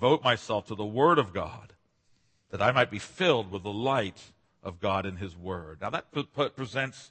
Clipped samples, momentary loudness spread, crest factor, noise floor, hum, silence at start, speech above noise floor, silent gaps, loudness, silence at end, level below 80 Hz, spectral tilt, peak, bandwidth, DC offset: under 0.1%; 14 LU; 22 dB; -68 dBFS; none; 0 s; 39 dB; none; -29 LUFS; 0.05 s; -62 dBFS; -5.5 dB/octave; -6 dBFS; 8.8 kHz; under 0.1%